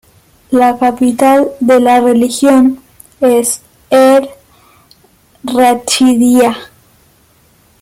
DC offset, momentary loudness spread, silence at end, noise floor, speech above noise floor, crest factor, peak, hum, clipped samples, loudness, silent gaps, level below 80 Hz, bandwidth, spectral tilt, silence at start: under 0.1%; 9 LU; 1.15 s; -49 dBFS; 40 dB; 12 dB; 0 dBFS; none; under 0.1%; -10 LUFS; none; -52 dBFS; 16 kHz; -3.5 dB/octave; 0.5 s